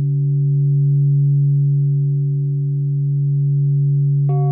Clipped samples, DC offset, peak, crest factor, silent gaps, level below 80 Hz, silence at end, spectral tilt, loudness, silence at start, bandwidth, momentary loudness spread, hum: under 0.1%; under 0.1%; -10 dBFS; 6 dB; none; -68 dBFS; 0 s; -17 dB/octave; -17 LUFS; 0 s; 1.2 kHz; 4 LU; 60 Hz at -70 dBFS